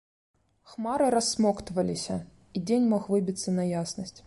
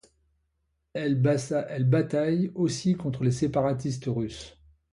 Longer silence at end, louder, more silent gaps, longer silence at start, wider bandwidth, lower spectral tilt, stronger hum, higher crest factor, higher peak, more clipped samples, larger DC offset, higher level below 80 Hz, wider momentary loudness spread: second, 0.05 s vs 0.45 s; about the same, -28 LUFS vs -27 LUFS; neither; second, 0.7 s vs 0.95 s; about the same, 11.5 kHz vs 11.5 kHz; second, -5.5 dB/octave vs -7 dB/octave; neither; about the same, 16 dB vs 16 dB; about the same, -14 dBFS vs -12 dBFS; neither; neither; about the same, -58 dBFS vs -58 dBFS; first, 12 LU vs 8 LU